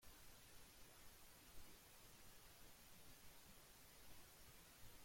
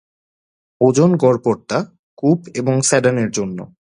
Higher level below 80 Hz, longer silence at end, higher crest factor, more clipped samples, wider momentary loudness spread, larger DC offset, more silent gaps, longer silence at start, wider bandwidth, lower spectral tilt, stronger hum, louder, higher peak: second, -72 dBFS vs -58 dBFS; second, 0 s vs 0.3 s; about the same, 16 dB vs 18 dB; neither; second, 0 LU vs 10 LU; neither; second, none vs 1.99-2.17 s; second, 0 s vs 0.8 s; first, 16.5 kHz vs 11.5 kHz; second, -2.5 dB/octave vs -5.5 dB/octave; neither; second, -65 LUFS vs -17 LUFS; second, -46 dBFS vs 0 dBFS